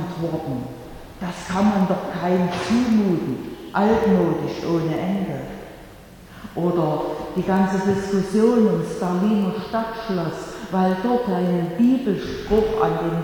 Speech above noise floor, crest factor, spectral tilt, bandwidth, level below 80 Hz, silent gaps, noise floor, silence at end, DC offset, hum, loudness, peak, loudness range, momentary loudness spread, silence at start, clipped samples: 22 dB; 16 dB; -7.5 dB/octave; 18.5 kHz; -46 dBFS; none; -43 dBFS; 0 s; under 0.1%; none; -21 LUFS; -6 dBFS; 3 LU; 12 LU; 0 s; under 0.1%